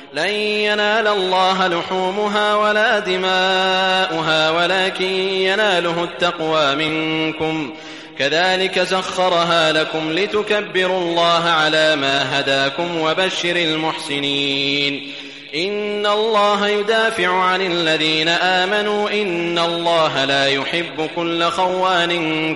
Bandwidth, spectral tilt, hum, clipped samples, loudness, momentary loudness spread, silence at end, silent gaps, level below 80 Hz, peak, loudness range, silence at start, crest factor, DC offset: 11.5 kHz; -3.5 dB/octave; none; under 0.1%; -17 LUFS; 6 LU; 0 s; none; -60 dBFS; -4 dBFS; 2 LU; 0 s; 14 dB; 0.2%